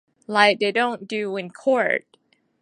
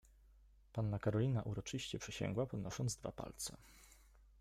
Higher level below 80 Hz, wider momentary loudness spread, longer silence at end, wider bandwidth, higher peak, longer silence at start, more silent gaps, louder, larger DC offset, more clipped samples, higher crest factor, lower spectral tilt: second, -76 dBFS vs -62 dBFS; about the same, 10 LU vs 10 LU; first, 0.65 s vs 0.15 s; second, 11 kHz vs 15 kHz; first, -2 dBFS vs -26 dBFS; about the same, 0.3 s vs 0.3 s; neither; first, -21 LUFS vs -42 LUFS; neither; neither; first, 22 dB vs 16 dB; second, -4 dB/octave vs -5.5 dB/octave